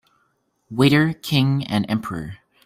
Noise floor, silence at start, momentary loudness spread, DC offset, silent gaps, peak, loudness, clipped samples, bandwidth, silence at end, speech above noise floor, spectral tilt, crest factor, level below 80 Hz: -67 dBFS; 0.7 s; 15 LU; under 0.1%; none; -2 dBFS; -20 LUFS; under 0.1%; 16 kHz; 0.3 s; 48 dB; -6.5 dB/octave; 18 dB; -54 dBFS